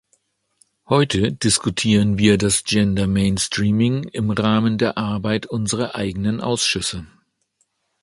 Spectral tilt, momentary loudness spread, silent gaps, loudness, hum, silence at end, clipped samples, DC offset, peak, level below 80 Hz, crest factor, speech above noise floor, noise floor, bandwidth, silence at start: -4.5 dB/octave; 7 LU; none; -19 LUFS; none; 0.95 s; under 0.1%; under 0.1%; -2 dBFS; -42 dBFS; 18 dB; 50 dB; -68 dBFS; 11.5 kHz; 0.9 s